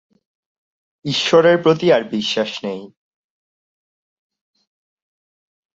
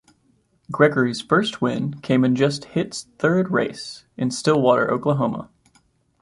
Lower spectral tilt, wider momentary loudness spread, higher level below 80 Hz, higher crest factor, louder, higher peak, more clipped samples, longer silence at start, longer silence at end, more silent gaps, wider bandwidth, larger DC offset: about the same, -5 dB/octave vs -6 dB/octave; first, 16 LU vs 10 LU; about the same, -64 dBFS vs -60 dBFS; about the same, 18 dB vs 18 dB; first, -16 LUFS vs -21 LUFS; about the same, -2 dBFS vs -4 dBFS; neither; first, 1.05 s vs 0.7 s; first, 2.9 s vs 0.75 s; neither; second, 7.8 kHz vs 11.5 kHz; neither